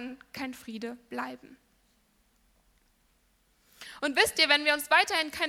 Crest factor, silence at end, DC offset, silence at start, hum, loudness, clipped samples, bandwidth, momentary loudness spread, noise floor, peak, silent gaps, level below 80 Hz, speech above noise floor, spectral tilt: 26 dB; 0 s; under 0.1%; 0 s; none; -26 LUFS; under 0.1%; 17 kHz; 20 LU; -69 dBFS; -6 dBFS; none; -66 dBFS; 40 dB; -1 dB/octave